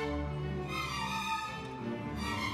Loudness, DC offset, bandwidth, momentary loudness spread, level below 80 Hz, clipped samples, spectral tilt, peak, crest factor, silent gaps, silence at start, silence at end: -36 LUFS; under 0.1%; 14 kHz; 5 LU; -48 dBFS; under 0.1%; -5 dB/octave; -22 dBFS; 14 dB; none; 0 s; 0 s